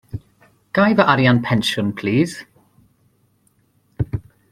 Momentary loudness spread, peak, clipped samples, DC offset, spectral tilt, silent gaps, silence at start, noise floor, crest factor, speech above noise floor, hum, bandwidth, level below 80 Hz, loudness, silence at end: 19 LU; 0 dBFS; under 0.1%; under 0.1%; -6 dB/octave; none; 0.15 s; -61 dBFS; 20 dB; 45 dB; none; 14 kHz; -46 dBFS; -18 LUFS; 0.3 s